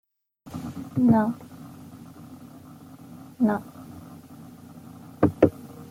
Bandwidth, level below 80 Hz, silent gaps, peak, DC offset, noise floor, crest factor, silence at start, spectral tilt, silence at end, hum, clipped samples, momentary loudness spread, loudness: 16 kHz; -60 dBFS; none; -2 dBFS; under 0.1%; -50 dBFS; 26 dB; 0.45 s; -8.5 dB/octave; 0.05 s; none; under 0.1%; 24 LU; -24 LUFS